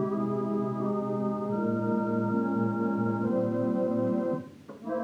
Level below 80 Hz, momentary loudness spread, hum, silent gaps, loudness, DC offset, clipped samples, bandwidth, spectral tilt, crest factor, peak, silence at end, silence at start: -74 dBFS; 4 LU; none; none; -29 LUFS; under 0.1%; under 0.1%; 6.4 kHz; -10 dB/octave; 12 dB; -16 dBFS; 0 s; 0 s